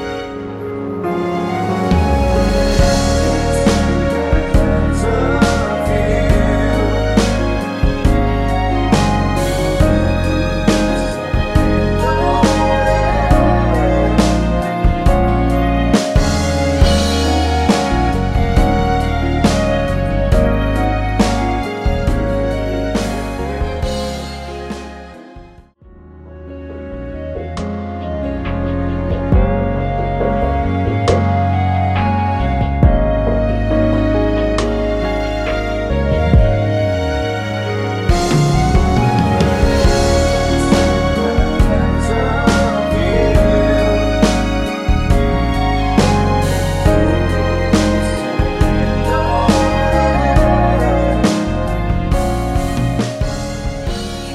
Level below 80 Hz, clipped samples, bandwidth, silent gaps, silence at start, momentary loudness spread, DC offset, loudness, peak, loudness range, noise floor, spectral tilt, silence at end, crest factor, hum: -20 dBFS; under 0.1%; 14 kHz; none; 0 s; 8 LU; under 0.1%; -15 LUFS; 0 dBFS; 6 LU; -41 dBFS; -6.5 dB/octave; 0 s; 14 dB; none